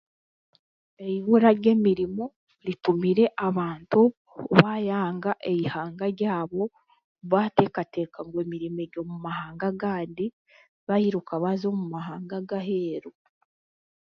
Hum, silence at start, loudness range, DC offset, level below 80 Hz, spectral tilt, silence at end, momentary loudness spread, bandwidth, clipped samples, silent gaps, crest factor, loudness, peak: none; 1 s; 6 LU; under 0.1%; -66 dBFS; -9 dB/octave; 0.95 s; 14 LU; 6 kHz; under 0.1%; 2.36-2.47 s, 4.17-4.25 s, 7.04-7.15 s, 10.33-10.45 s, 10.69-10.87 s; 24 dB; -26 LUFS; -2 dBFS